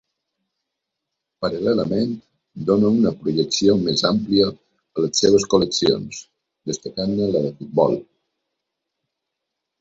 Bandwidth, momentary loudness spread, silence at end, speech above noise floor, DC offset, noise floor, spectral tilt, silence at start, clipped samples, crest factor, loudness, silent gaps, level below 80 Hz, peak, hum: 7.8 kHz; 12 LU; 1.8 s; 62 dB; under 0.1%; -81 dBFS; -5 dB/octave; 1.4 s; under 0.1%; 20 dB; -20 LUFS; none; -54 dBFS; -2 dBFS; none